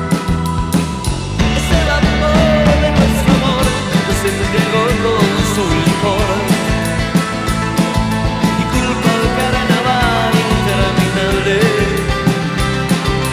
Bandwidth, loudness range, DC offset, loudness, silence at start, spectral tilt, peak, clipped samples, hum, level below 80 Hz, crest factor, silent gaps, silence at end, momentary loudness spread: 16 kHz; 2 LU; under 0.1%; -14 LUFS; 0 s; -5.5 dB/octave; -2 dBFS; under 0.1%; none; -24 dBFS; 12 dB; none; 0 s; 4 LU